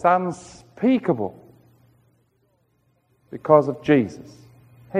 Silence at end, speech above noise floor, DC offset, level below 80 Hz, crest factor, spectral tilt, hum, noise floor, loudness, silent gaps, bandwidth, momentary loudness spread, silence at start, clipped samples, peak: 0 s; 46 dB; under 0.1%; -62 dBFS; 22 dB; -7.5 dB/octave; none; -66 dBFS; -21 LUFS; none; 10 kHz; 22 LU; 0 s; under 0.1%; -2 dBFS